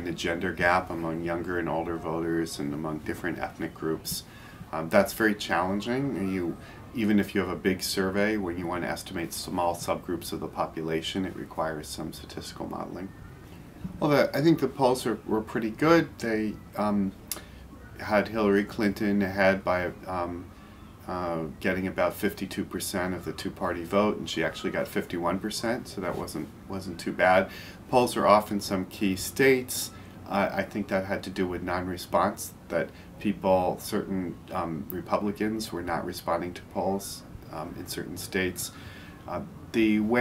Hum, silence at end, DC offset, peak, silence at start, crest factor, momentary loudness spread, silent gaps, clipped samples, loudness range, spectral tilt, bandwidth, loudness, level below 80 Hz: none; 0 s; under 0.1%; -4 dBFS; 0 s; 24 dB; 14 LU; none; under 0.1%; 6 LU; -5 dB/octave; 16 kHz; -29 LUFS; -54 dBFS